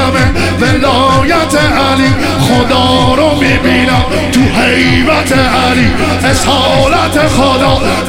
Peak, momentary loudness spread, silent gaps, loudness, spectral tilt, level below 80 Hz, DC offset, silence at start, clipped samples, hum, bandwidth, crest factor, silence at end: 0 dBFS; 2 LU; none; -9 LUFS; -5 dB/octave; -24 dBFS; 1%; 0 s; under 0.1%; none; 16.5 kHz; 8 dB; 0 s